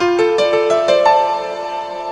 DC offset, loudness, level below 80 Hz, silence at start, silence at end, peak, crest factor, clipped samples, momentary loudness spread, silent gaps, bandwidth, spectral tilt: under 0.1%; -15 LUFS; -54 dBFS; 0 s; 0 s; 0 dBFS; 14 dB; under 0.1%; 11 LU; none; 10.5 kHz; -4 dB/octave